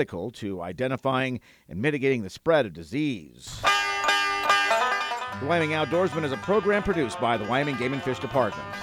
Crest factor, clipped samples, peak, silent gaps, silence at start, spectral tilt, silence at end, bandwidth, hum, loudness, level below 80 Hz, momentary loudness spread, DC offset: 18 dB; under 0.1%; -8 dBFS; none; 0 s; -4.5 dB/octave; 0 s; 16.5 kHz; none; -25 LUFS; -54 dBFS; 8 LU; under 0.1%